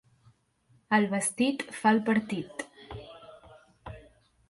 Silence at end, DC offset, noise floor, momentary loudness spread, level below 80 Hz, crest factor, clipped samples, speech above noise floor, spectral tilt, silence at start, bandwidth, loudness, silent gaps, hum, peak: 0.5 s; under 0.1%; -66 dBFS; 23 LU; -60 dBFS; 20 dB; under 0.1%; 39 dB; -4.5 dB/octave; 0.9 s; 11.5 kHz; -28 LUFS; none; none; -12 dBFS